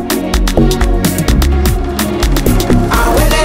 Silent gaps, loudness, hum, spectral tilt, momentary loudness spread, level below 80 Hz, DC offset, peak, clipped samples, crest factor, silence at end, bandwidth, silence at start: none; -12 LUFS; none; -5 dB/octave; 4 LU; -14 dBFS; 0.8%; 0 dBFS; under 0.1%; 10 dB; 0 s; 16.5 kHz; 0 s